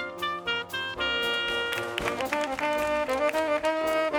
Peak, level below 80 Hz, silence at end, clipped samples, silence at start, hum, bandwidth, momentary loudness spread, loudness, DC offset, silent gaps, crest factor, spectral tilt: -10 dBFS; -54 dBFS; 0 s; under 0.1%; 0 s; none; over 20 kHz; 4 LU; -27 LUFS; under 0.1%; none; 18 dB; -3 dB/octave